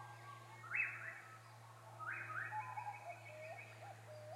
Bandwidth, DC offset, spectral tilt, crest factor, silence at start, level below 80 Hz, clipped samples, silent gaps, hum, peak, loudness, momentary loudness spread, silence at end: 16 kHz; under 0.1%; -4 dB/octave; 20 dB; 0 s; -90 dBFS; under 0.1%; none; none; -28 dBFS; -47 LUFS; 17 LU; 0 s